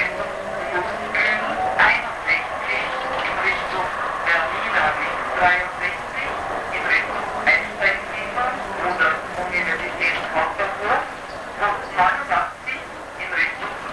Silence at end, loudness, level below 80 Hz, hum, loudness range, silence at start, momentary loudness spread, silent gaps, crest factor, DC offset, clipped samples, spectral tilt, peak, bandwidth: 0 s; -21 LUFS; -48 dBFS; none; 2 LU; 0 s; 8 LU; none; 18 dB; under 0.1%; under 0.1%; -3.5 dB/octave; -4 dBFS; 11 kHz